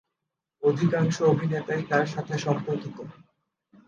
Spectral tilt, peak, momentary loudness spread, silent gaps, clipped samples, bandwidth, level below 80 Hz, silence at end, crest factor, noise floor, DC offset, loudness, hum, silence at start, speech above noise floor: -7 dB/octave; -6 dBFS; 12 LU; none; under 0.1%; 7.6 kHz; -68 dBFS; 0.75 s; 20 dB; -85 dBFS; under 0.1%; -26 LUFS; none; 0.6 s; 59 dB